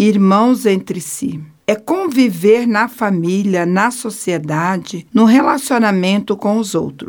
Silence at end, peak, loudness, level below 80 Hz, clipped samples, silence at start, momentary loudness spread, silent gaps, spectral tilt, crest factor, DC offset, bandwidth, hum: 0 s; -2 dBFS; -15 LUFS; -60 dBFS; under 0.1%; 0 s; 10 LU; none; -5.5 dB/octave; 14 dB; under 0.1%; 19 kHz; none